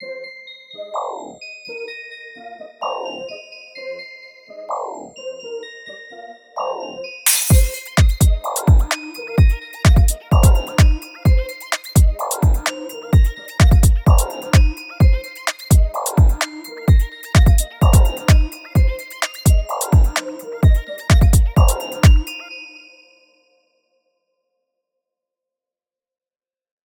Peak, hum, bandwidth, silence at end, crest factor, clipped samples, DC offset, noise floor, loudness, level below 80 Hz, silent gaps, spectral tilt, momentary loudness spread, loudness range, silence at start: 0 dBFS; none; over 20 kHz; 4.2 s; 16 dB; under 0.1%; under 0.1%; under -90 dBFS; -17 LUFS; -20 dBFS; none; -5 dB/octave; 19 LU; 14 LU; 0 s